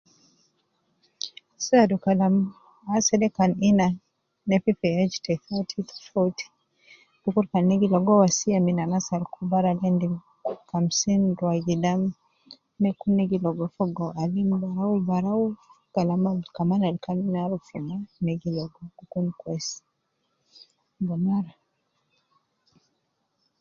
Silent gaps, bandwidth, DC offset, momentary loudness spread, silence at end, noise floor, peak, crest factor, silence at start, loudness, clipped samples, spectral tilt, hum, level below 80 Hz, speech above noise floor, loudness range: none; 7.4 kHz; under 0.1%; 13 LU; 2.1 s; -75 dBFS; -6 dBFS; 20 dB; 1.25 s; -25 LUFS; under 0.1%; -6 dB/octave; none; -62 dBFS; 51 dB; 9 LU